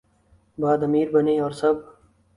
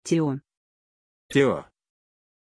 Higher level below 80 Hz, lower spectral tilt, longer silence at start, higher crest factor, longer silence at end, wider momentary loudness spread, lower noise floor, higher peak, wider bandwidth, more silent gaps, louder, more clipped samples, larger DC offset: about the same, -60 dBFS vs -62 dBFS; first, -8 dB/octave vs -6 dB/octave; first, 0.6 s vs 0.05 s; about the same, 16 dB vs 20 dB; second, 0.45 s vs 0.95 s; second, 6 LU vs 11 LU; second, -60 dBFS vs under -90 dBFS; about the same, -6 dBFS vs -8 dBFS; about the same, 11 kHz vs 11 kHz; second, none vs 0.57-1.29 s; about the same, -22 LUFS vs -24 LUFS; neither; neither